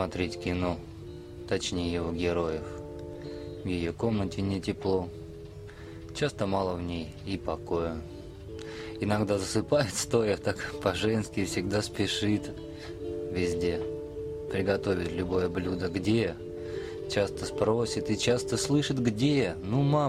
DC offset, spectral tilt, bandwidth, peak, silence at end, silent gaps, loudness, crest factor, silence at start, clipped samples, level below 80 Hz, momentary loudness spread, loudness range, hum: under 0.1%; -5.5 dB/octave; 15 kHz; -10 dBFS; 0 s; none; -30 LUFS; 20 dB; 0 s; under 0.1%; -50 dBFS; 14 LU; 5 LU; none